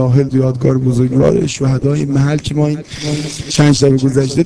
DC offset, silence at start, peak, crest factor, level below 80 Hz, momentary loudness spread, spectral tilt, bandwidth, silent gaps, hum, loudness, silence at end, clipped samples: under 0.1%; 0 s; 0 dBFS; 12 dB; -38 dBFS; 8 LU; -6.5 dB/octave; 11 kHz; none; none; -13 LUFS; 0 s; 0.3%